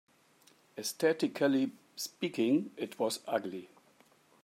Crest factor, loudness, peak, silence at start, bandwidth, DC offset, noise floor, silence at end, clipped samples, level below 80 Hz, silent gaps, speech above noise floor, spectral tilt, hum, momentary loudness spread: 18 dB; -33 LUFS; -16 dBFS; 0.75 s; 16 kHz; under 0.1%; -65 dBFS; 0.75 s; under 0.1%; -86 dBFS; none; 33 dB; -4.5 dB/octave; none; 11 LU